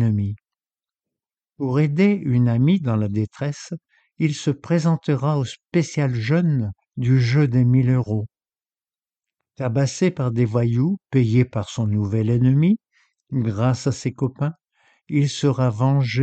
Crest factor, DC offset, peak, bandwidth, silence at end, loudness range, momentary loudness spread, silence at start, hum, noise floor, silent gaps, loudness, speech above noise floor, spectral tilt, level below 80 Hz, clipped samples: 16 dB; under 0.1%; -4 dBFS; 8.6 kHz; 0 s; 3 LU; 10 LU; 0 s; none; under -90 dBFS; none; -21 LUFS; over 71 dB; -7.5 dB/octave; -54 dBFS; under 0.1%